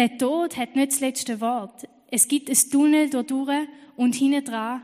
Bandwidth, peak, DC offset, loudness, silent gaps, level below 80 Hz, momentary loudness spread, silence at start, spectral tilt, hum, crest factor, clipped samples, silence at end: 15.5 kHz; -4 dBFS; under 0.1%; -22 LUFS; none; -74 dBFS; 9 LU; 0 s; -2.5 dB/octave; none; 20 dB; under 0.1%; 0 s